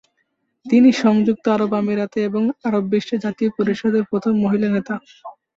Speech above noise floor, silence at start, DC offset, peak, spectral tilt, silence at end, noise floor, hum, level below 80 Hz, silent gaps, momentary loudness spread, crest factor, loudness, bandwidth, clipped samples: 52 dB; 0.65 s; under 0.1%; -4 dBFS; -7 dB/octave; 0.25 s; -70 dBFS; none; -60 dBFS; none; 8 LU; 16 dB; -19 LUFS; 7.6 kHz; under 0.1%